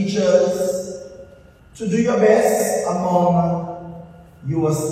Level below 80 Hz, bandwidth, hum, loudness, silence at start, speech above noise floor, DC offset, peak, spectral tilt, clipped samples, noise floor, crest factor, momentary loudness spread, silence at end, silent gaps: -52 dBFS; 16 kHz; none; -18 LUFS; 0 s; 29 dB; under 0.1%; -2 dBFS; -6 dB/octave; under 0.1%; -46 dBFS; 18 dB; 19 LU; 0 s; none